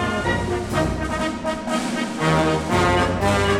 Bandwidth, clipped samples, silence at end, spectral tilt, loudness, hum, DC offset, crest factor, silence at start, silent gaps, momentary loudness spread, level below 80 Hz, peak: 16 kHz; under 0.1%; 0 s; -5.5 dB/octave; -21 LUFS; none; 0.2%; 14 dB; 0 s; none; 6 LU; -36 dBFS; -6 dBFS